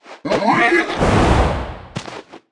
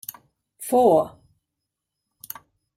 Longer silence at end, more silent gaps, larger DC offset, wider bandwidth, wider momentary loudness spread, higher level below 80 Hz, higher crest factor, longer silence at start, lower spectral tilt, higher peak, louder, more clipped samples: second, 0.15 s vs 1.7 s; neither; neither; second, 11.5 kHz vs 16 kHz; second, 17 LU vs 21 LU; first, -26 dBFS vs -64 dBFS; about the same, 16 dB vs 20 dB; second, 0.05 s vs 0.6 s; about the same, -6 dB/octave vs -6 dB/octave; first, -2 dBFS vs -6 dBFS; first, -16 LUFS vs -20 LUFS; neither